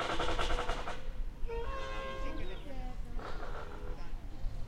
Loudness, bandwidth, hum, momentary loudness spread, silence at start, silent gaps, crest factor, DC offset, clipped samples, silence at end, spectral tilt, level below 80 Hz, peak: -41 LUFS; 9.8 kHz; none; 12 LU; 0 s; none; 16 dB; under 0.1%; under 0.1%; 0 s; -4.5 dB/octave; -38 dBFS; -18 dBFS